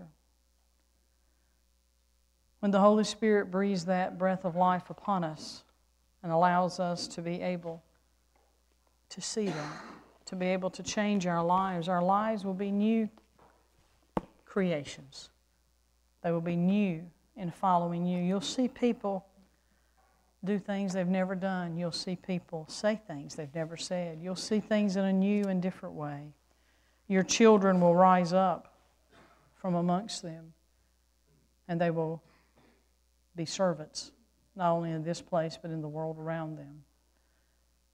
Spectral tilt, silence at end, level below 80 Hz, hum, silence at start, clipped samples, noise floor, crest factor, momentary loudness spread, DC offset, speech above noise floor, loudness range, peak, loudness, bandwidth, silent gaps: -6 dB/octave; 1.15 s; -68 dBFS; none; 0 s; under 0.1%; -71 dBFS; 22 dB; 16 LU; under 0.1%; 41 dB; 10 LU; -10 dBFS; -31 LUFS; 11 kHz; none